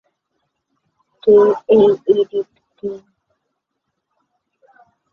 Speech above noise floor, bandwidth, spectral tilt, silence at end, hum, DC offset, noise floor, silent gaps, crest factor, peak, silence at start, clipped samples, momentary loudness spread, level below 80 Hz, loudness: 62 dB; 4.2 kHz; -8 dB/octave; 2.15 s; none; under 0.1%; -76 dBFS; none; 16 dB; -2 dBFS; 1.25 s; under 0.1%; 18 LU; -60 dBFS; -14 LUFS